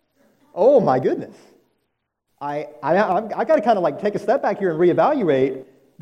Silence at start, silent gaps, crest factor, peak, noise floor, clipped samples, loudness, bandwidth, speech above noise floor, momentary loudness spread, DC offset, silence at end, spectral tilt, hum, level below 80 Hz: 0.55 s; none; 16 dB; -4 dBFS; -74 dBFS; under 0.1%; -19 LUFS; 8.8 kHz; 56 dB; 13 LU; under 0.1%; 0.4 s; -8 dB/octave; none; -66 dBFS